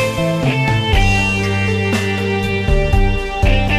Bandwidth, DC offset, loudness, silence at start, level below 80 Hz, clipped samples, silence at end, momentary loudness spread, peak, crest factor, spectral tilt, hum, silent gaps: 15 kHz; under 0.1%; -16 LUFS; 0 s; -20 dBFS; under 0.1%; 0 s; 4 LU; -2 dBFS; 12 dB; -5.5 dB/octave; none; none